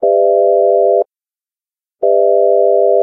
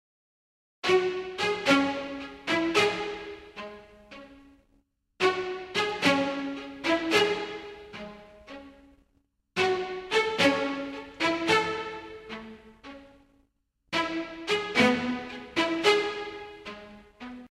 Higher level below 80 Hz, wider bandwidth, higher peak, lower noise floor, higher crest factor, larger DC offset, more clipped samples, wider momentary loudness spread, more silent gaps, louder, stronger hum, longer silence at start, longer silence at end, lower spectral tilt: second, -78 dBFS vs -62 dBFS; second, 1.1 kHz vs 15 kHz; first, 0 dBFS vs -8 dBFS; first, under -90 dBFS vs -73 dBFS; second, 10 dB vs 22 dB; neither; neither; second, 5 LU vs 22 LU; neither; first, -11 LUFS vs -27 LUFS; neither; second, 0 s vs 0.85 s; about the same, 0 s vs 0.05 s; first, -12 dB/octave vs -3.5 dB/octave